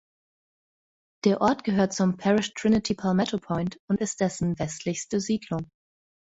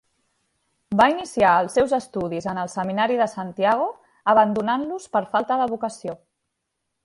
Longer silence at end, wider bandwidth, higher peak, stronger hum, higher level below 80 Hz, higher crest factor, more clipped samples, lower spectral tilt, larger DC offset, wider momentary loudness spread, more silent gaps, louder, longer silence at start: second, 0.65 s vs 0.9 s; second, 8 kHz vs 11.5 kHz; second, -8 dBFS vs -2 dBFS; neither; about the same, -56 dBFS vs -58 dBFS; about the same, 18 dB vs 20 dB; neither; about the same, -5.5 dB/octave vs -5.5 dB/octave; neither; second, 7 LU vs 10 LU; first, 3.80-3.88 s vs none; second, -26 LUFS vs -22 LUFS; first, 1.25 s vs 0.9 s